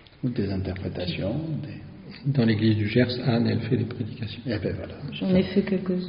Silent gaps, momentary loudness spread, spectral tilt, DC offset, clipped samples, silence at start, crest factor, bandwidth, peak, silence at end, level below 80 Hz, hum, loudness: none; 12 LU; -6.5 dB/octave; under 0.1%; under 0.1%; 0.2 s; 18 dB; 5.4 kHz; -6 dBFS; 0 s; -52 dBFS; none; -26 LUFS